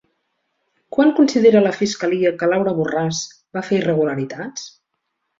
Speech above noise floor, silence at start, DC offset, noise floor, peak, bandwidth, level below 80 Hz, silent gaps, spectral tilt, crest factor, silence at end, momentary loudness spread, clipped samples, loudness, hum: 57 dB; 0.9 s; under 0.1%; -75 dBFS; -2 dBFS; 7.8 kHz; -60 dBFS; none; -5.5 dB/octave; 16 dB; 0.7 s; 16 LU; under 0.1%; -18 LUFS; none